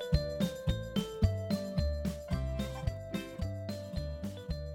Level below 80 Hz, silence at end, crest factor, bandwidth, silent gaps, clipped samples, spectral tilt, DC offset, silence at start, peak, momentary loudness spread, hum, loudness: -40 dBFS; 0 s; 20 dB; 17 kHz; none; under 0.1%; -7 dB/octave; under 0.1%; 0 s; -14 dBFS; 8 LU; none; -36 LUFS